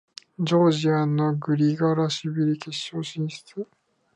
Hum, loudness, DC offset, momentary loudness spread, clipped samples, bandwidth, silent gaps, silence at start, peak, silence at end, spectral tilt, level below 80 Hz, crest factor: none; -24 LUFS; under 0.1%; 16 LU; under 0.1%; 10 kHz; none; 0.4 s; -10 dBFS; 0.5 s; -6.5 dB/octave; -72 dBFS; 16 dB